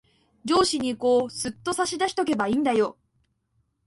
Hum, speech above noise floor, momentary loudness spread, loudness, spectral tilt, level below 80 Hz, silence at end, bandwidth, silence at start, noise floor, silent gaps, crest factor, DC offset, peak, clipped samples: none; 48 dB; 8 LU; -24 LUFS; -3.5 dB/octave; -58 dBFS; 0.95 s; 11.5 kHz; 0.45 s; -71 dBFS; none; 18 dB; under 0.1%; -8 dBFS; under 0.1%